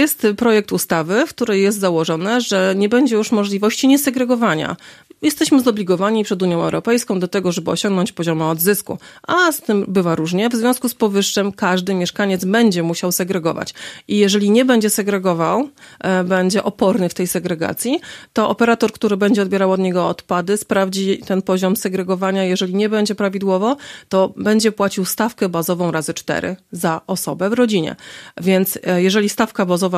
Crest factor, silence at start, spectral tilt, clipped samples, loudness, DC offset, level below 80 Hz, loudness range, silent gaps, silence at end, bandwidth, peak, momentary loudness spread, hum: 16 dB; 0 s; -5 dB/octave; under 0.1%; -17 LUFS; under 0.1%; -58 dBFS; 2 LU; none; 0 s; 15.5 kHz; -2 dBFS; 7 LU; none